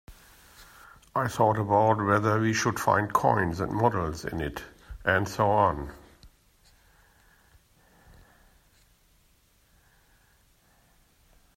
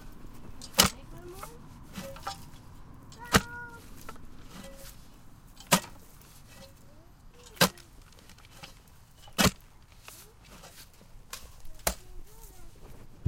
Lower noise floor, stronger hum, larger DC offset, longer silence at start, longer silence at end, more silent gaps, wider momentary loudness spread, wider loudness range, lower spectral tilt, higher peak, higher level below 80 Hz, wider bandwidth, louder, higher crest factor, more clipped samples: first, -64 dBFS vs -54 dBFS; neither; neither; about the same, 0.1 s vs 0 s; first, 5.3 s vs 0 s; neither; second, 11 LU vs 26 LU; about the same, 6 LU vs 4 LU; first, -6 dB/octave vs -2.5 dB/octave; second, -8 dBFS vs -4 dBFS; about the same, -52 dBFS vs -48 dBFS; about the same, 16 kHz vs 17 kHz; about the same, -26 LUFS vs -28 LUFS; second, 22 dB vs 32 dB; neither